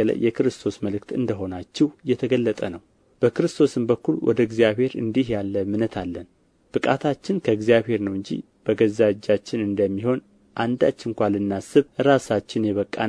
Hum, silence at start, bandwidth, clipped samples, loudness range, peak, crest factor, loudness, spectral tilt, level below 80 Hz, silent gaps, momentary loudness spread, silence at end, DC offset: none; 0 s; 11 kHz; under 0.1%; 2 LU; -4 dBFS; 18 dB; -23 LUFS; -6.5 dB/octave; -56 dBFS; none; 10 LU; 0 s; under 0.1%